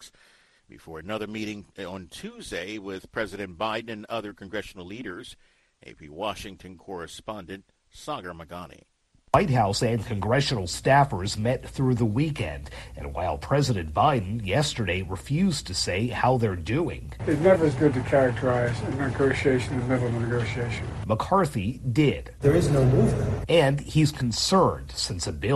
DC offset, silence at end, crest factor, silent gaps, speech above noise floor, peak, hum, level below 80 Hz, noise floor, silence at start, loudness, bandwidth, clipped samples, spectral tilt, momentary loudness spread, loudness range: under 0.1%; 0 s; 20 dB; none; 34 dB; -4 dBFS; none; -44 dBFS; -59 dBFS; 0 s; -25 LUFS; 12.5 kHz; under 0.1%; -5.5 dB/octave; 17 LU; 14 LU